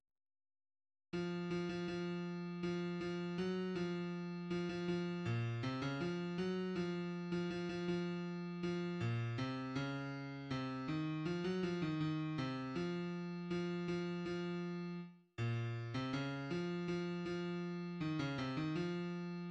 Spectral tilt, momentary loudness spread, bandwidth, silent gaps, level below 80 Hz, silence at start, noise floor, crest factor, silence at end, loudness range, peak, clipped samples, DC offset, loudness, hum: -7 dB/octave; 4 LU; 8.4 kHz; none; -70 dBFS; 1.15 s; under -90 dBFS; 14 dB; 0 s; 2 LU; -28 dBFS; under 0.1%; under 0.1%; -42 LUFS; none